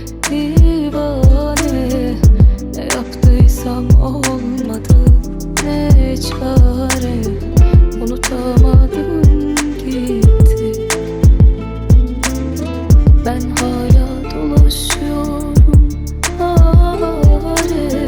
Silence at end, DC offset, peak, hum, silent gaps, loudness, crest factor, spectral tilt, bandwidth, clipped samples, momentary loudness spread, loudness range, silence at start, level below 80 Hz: 0 s; under 0.1%; 0 dBFS; none; none; -13 LUFS; 10 dB; -6 dB/octave; 19.5 kHz; under 0.1%; 9 LU; 1 LU; 0 s; -14 dBFS